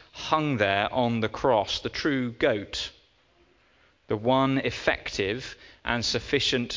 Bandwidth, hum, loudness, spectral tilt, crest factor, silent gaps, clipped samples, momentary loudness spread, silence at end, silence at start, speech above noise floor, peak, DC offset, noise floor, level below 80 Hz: 7.6 kHz; none; -26 LUFS; -4.5 dB/octave; 22 dB; none; under 0.1%; 9 LU; 0 s; 0.15 s; 36 dB; -6 dBFS; under 0.1%; -63 dBFS; -50 dBFS